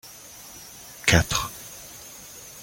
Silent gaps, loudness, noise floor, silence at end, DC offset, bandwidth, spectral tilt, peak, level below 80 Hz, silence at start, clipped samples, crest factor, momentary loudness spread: none; -23 LUFS; -44 dBFS; 0 s; under 0.1%; 17 kHz; -3 dB/octave; -2 dBFS; -42 dBFS; 0.05 s; under 0.1%; 26 dB; 21 LU